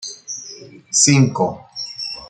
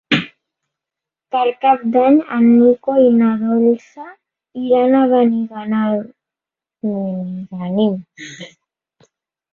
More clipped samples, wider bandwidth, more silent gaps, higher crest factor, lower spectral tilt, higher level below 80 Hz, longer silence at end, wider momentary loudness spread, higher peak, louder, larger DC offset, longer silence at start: neither; first, 9.4 kHz vs 7 kHz; neither; first, 20 dB vs 14 dB; second, -3.5 dB/octave vs -7.5 dB/octave; first, -56 dBFS vs -62 dBFS; second, 0 s vs 1.05 s; second, 17 LU vs 20 LU; about the same, 0 dBFS vs -2 dBFS; about the same, -16 LUFS vs -15 LUFS; neither; about the same, 0 s vs 0.1 s